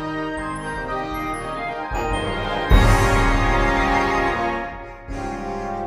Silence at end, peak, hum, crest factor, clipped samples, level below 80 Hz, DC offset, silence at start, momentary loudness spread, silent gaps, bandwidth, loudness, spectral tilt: 0 s; 0 dBFS; none; 20 dB; under 0.1%; -26 dBFS; under 0.1%; 0 s; 11 LU; none; 14 kHz; -21 LUFS; -5.5 dB/octave